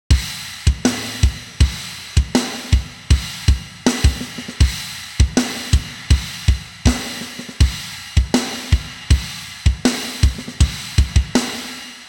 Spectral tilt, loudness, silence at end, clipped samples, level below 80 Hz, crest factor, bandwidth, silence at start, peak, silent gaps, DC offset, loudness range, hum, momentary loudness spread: -4.5 dB/octave; -20 LUFS; 0 s; under 0.1%; -20 dBFS; 18 dB; 17.5 kHz; 0.1 s; -2 dBFS; none; under 0.1%; 1 LU; none; 9 LU